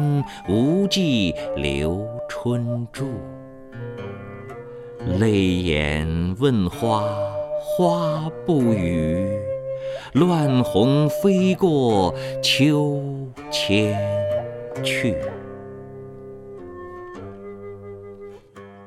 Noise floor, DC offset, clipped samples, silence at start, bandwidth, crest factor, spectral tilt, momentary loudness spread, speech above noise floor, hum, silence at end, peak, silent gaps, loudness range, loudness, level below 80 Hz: -43 dBFS; under 0.1%; under 0.1%; 0 s; 15.5 kHz; 18 dB; -6 dB/octave; 19 LU; 23 dB; none; 0 s; -4 dBFS; none; 10 LU; -21 LUFS; -42 dBFS